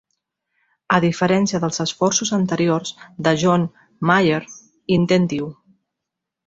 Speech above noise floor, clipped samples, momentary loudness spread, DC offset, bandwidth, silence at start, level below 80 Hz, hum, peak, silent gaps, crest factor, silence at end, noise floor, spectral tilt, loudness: 64 dB; under 0.1%; 11 LU; under 0.1%; 7.8 kHz; 0.9 s; -56 dBFS; none; -2 dBFS; none; 18 dB; 0.95 s; -82 dBFS; -5 dB/octave; -19 LUFS